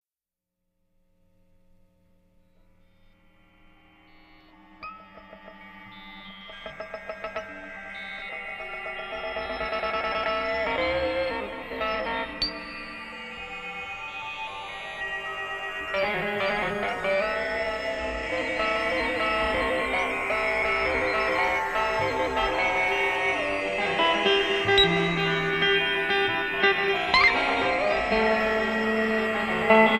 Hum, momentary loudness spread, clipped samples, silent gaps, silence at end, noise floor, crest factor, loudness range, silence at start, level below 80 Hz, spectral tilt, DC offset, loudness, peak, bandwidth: none; 15 LU; under 0.1%; none; 0 s; under -90 dBFS; 22 dB; 15 LU; 4.8 s; -48 dBFS; -4.5 dB/octave; under 0.1%; -25 LUFS; -4 dBFS; 15.5 kHz